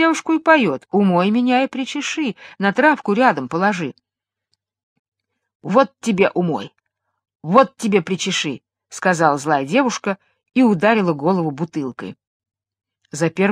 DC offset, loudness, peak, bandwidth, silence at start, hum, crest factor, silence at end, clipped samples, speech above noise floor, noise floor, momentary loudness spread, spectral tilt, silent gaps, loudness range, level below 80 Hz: under 0.1%; -18 LUFS; 0 dBFS; 12.5 kHz; 0 s; none; 18 dB; 0 s; under 0.1%; 56 dB; -73 dBFS; 13 LU; -5 dB/octave; 4.83-5.12 s, 5.55-5.60 s, 7.35-7.39 s, 12.27-12.40 s; 4 LU; -66 dBFS